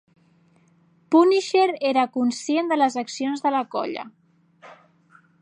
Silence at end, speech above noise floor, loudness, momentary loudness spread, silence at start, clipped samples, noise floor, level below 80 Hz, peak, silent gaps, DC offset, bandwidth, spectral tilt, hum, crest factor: 0.7 s; 38 dB; -22 LUFS; 11 LU; 1.1 s; under 0.1%; -59 dBFS; -82 dBFS; -4 dBFS; none; under 0.1%; 10.5 kHz; -3.5 dB/octave; none; 18 dB